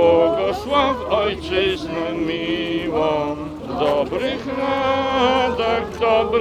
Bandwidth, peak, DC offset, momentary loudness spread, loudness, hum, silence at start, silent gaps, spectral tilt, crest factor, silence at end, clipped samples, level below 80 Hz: 13.5 kHz; -4 dBFS; under 0.1%; 6 LU; -20 LUFS; none; 0 s; none; -5.5 dB/octave; 16 dB; 0 s; under 0.1%; -42 dBFS